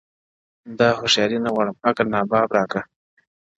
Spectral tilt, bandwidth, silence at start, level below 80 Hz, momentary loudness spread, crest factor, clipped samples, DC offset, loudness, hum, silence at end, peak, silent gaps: -4 dB/octave; 8 kHz; 0.65 s; -58 dBFS; 10 LU; 20 dB; under 0.1%; under 0.1%; -20 LUFS; none; 0.75 s; -2 dBFS; none